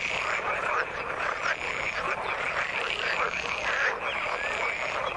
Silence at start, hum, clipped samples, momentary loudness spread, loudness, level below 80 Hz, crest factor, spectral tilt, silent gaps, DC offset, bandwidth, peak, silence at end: 0 s; none; under 0.1%; 3 LU; -28 LUFS; -56 dBFS; 18 dB; -2 dB/octave; none; under 0.1%; 11.5 kHz; -12 dBFS; 0 s